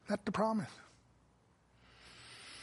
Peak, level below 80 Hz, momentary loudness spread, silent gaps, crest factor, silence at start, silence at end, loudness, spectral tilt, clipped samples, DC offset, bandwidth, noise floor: -20 dBFS; -72 dBFS; 23 LU; none; 22 dB; 0.05 s; 0 s; -37 LUFS; -6 dB/octave; under 0.1%; under 0.1%; 11.5 kHz; -70 dBFS